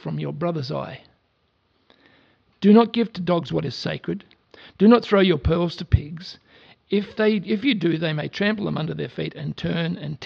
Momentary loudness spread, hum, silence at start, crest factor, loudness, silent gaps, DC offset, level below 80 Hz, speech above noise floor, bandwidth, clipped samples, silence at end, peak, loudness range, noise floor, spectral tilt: 14 LU; none; 0.05 s; 20 dB; -22 LUFS; none; under 0.1%; -42 dBFS; 46 dB; 6.8 kHz; under 0.1%; 0 s; -2 dBFS; 4 LU; -67 dBFS; -8 dB/octave